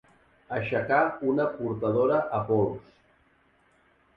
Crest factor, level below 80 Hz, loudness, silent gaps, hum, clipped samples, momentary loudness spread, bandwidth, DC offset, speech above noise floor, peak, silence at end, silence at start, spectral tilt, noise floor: 18 dB; -60 dBFS; -27 LUFS; none; none; under 0.1%; 8 LU; 5.6 kHz; under 0.1%; 38 dB; -10 dBFS; 1.35 s; 0.5 s; -10 dB/octave; -64 dBFS